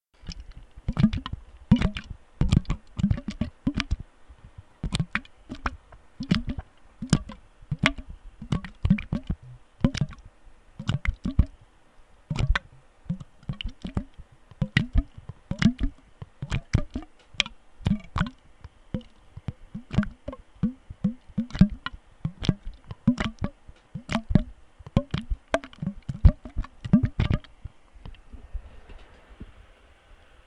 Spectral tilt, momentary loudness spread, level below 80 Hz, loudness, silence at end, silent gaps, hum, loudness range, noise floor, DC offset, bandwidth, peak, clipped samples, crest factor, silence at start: -6.5 dB/octave; 22 LU; -34 dBFS; -29 LUFS; 0.95 s; none; none; 5 LU; -54 dBFS; under 0.1%; 11 kHz; 0 dBFS; under 0.1%; 28 dB; 0.25 s